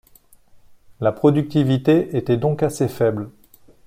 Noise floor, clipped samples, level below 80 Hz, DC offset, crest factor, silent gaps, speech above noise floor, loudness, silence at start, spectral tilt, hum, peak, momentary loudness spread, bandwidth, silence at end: -52 dBFS; under 0.1%; -54 dBFS; under 0.1%; 18 dB; none; 33 dB; -19 LUFS; 1 s; -7.5 dB/octave; none; -2 dBFS; 7 LU; 16 kHz; 0.6 s